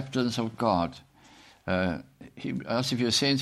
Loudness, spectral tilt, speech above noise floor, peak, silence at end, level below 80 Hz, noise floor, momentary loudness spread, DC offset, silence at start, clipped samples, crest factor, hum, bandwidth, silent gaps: -28 LUFS; -4.5 dB/octave; 27 dB; -12 dBFS; 0 s; -58 dBFS; -55 dBFS; 14 LU; under 0.1%; 0 s; under 0.1%; 18 dB; none; 15.5 kHz; none